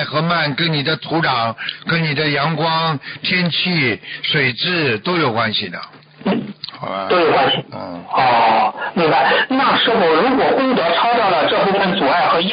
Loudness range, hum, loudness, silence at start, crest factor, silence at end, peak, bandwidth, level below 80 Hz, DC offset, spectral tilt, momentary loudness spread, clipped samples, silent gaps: 4 LU; none; -16 LUFS; 0 s; 12 dB; 0 s; -6 dBFS; 5.2 kHz; -56 dBFS; under 0.1%; -10.5 dB/octave; 8 LU; under 0.1%; none